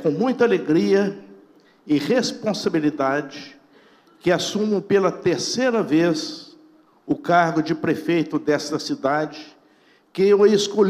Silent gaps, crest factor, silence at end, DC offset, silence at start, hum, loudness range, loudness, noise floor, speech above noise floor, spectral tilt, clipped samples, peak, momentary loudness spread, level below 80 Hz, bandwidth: none; 16 dB; 0 s; under 0.1%; 0 s; none; 2 LU; -21 LUFS; -56 dBFS; 37 dB; -5 dB/octave; under 0.1%; -4 dBFS; 9 LU; -64 dBFS; 14.5 kHz